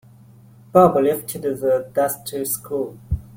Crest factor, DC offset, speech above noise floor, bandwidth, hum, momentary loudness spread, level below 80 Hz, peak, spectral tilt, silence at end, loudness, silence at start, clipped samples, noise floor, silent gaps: 20 dB; under 0.1%; 28 dB; 16.5 kHz; none; 12 LU; -42 dBFS; -2 dBFS; -6 dB/octave; 0 s; -20 LUFS; 0.75 s; under 0.1%; -47 dBFS; none